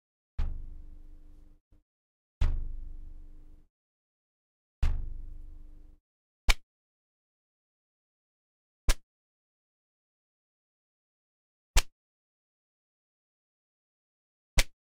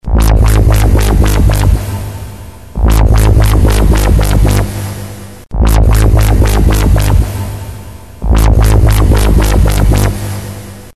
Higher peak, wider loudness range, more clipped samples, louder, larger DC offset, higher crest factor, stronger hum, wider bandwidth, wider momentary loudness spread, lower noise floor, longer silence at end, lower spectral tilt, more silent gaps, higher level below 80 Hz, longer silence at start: second, -6 dBFS vs 0 dBFS; first, 5 LU vs 1 LU; second, under 0.1% vs 0.7%; second, -35 LUFS vs -10 LUFS; second, under 0.1% vs 2%; first, 28 dB vs 8 dB; neither; first, 15.5 kHz vs 13.5 kHz; first, 22 LU vs 16 LU; first, -50 dBFS vs -28 dBFS; first, 0.3 s vs 0.05 s; second, -2.5 dB/octave vs -6 dB/octave; first, 1.61-1.71 s, 1.82-2.41 s, 3.70-4.82 s, 6.00-6.48 s, 6.63-8.88 s, 9.03-11.74 s, 11.92-14.57 s vs none; second, -36 dBFS vs -10 dBFS; first, 0.4 s vs 0.05 s